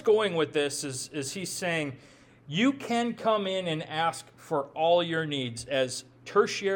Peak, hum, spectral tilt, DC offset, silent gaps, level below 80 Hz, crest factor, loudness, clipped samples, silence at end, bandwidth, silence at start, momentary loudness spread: -10 dBFS; none; -4 dB/octave; under 0.1%; none; -68 dBFS; 18 dB; -29 LUFS; under 0.1%; 0 s; 18 kHz; 0 s; 9 LU